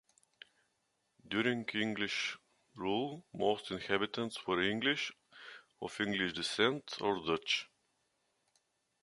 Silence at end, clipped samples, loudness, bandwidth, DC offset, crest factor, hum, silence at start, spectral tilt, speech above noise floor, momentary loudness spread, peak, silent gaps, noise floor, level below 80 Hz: 1.35 s; under 0.1%; -35 LUFS; 11.5 kHz; under 0.1%; 24 dB; none; 1.25 s; -4 dB/octave; 45 dB; 14 LU; -14 dBFS; none; -81 dBFS; -72 dBFS